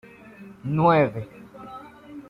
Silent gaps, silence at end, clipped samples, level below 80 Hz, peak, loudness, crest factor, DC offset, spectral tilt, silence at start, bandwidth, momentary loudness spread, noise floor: none; 0.1 s; under 0.1%; -56 dBFS; -6 dBFS; -21 LUFS; 18 dB; under 0.1%; -9 dB/octave; 0.4 s; 5.4 kHz; 25 LU; -45 dBFS